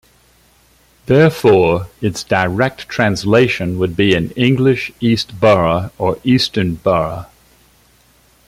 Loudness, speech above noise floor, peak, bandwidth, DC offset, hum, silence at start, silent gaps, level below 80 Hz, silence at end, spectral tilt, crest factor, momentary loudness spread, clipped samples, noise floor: -15 LUFS; 38 dB; 0 dBFS; 16 kHz; under 0.1%; none; 1.1 s; none; -44 dBFS; 1.25 s; -6 dB/octave; 14 dB; 7 LU; under 0.1%; -52 dBFS